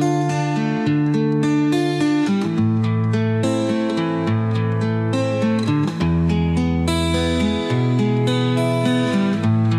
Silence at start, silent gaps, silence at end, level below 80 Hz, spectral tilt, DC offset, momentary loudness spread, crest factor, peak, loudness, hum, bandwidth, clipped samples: 0 s; none; 0 s; -42 dBFS; -7 dB/octave; under 0.1%; 2 LU; 12 dB; -6 dBFS; -19 LUFS; none; 12.5 kHz; under 0.1%